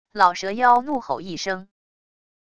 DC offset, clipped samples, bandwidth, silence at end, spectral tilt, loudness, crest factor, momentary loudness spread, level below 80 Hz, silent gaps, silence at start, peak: under 0.1%; under 0.1%; 9.8 kHz; 0.8 s; -3.5 dB/octave; -21 LUFS; 20 dB; 11 LU; -62 dBFS; none; 0.15 s; -2 dBFS